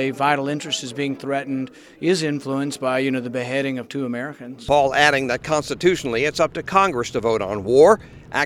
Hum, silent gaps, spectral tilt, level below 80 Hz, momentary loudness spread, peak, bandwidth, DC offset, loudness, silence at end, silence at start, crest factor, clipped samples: none; none; -4.5 dB/octave; -50 dBFS; 12 LU; 0 dBFS; 15 kHz; under 0.1%; -20 LUFS; 0 s; 0 s; 20 dB; under 0.1%